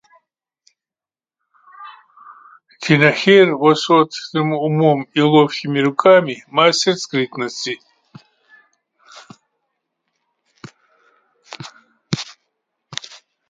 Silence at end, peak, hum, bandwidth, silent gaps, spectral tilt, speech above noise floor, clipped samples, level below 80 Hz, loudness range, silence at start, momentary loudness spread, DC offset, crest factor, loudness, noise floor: 0.55 s; 0 dBFS; none; 9.4 kHz; none; -5 dB/octave; over 75 dB; under 0.1%; -66 dBFS; 19 LU; 1.8 s; 20 LU; under 0.1%; 18 dB; -15 LUFS; under -90 dBFS